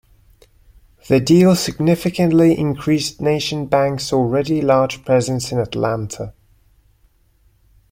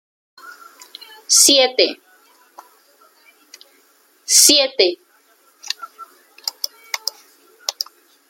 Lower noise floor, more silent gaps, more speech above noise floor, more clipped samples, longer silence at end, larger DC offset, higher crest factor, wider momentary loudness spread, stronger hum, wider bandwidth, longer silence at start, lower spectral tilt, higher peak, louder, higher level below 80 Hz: about the same, -57 dBFS vs -56 dBFS; neither; about the same, 40 dB vs 42 dB; neither; first, 1.6 s vs 0.45 s; neither; about the same, 16 dB vs 20 dB; second, 8 LU vs 27 LU; neither; about the same, 16.5 kHz vs 16.5 kHz; first, 1.05 s vs 0.45 s; first, -6 dB/octave vs 1.5 dB/octave; about the same, -2 dBFS vs 0 dBFS; about the same, -17 LUFS vs -15 LUFS; first, -48 dBFS vs -72 dBFS